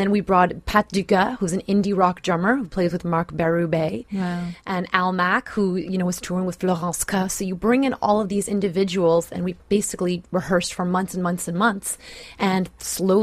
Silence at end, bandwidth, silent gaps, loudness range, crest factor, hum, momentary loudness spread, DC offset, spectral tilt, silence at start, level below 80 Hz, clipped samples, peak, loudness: 0 s; 15.5 kHz; none; 2 LU; 20 dB; none; 7 LU; under 0.1%; -5 dB/octave; 0 s; -48 dBFS; under 0.1%; 0 dBFS; -22 LUFS